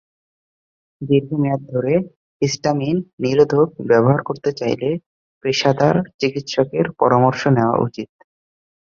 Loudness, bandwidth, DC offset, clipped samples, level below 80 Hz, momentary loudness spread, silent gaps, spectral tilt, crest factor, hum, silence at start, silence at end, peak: -18 LUFS; 7.4 kHz; under 0.1%; under 0.1%; -56 dBFS; 9 LU; 2.16-2.40 s, 3.13-3.18 s, 5.06-5.41 s, 6.14-6.19 s; -6.5 dB/octave; 18 dB; none; 1 s; 0.75 s; -2 dBFS